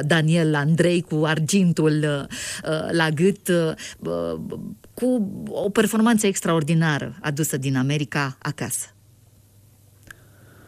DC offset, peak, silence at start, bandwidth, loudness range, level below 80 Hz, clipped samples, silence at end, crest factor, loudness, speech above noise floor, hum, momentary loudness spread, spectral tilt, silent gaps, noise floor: under 0.1%; -6 dBFS; 0 s; 15.5 kHz; 5 LU; -58 dBFS; under 0.1%; 1.8 s; 16 dB; -22 LUFS; 32 dB; none; 10 LU; -5.5 dB/octave; none; -53 dBFS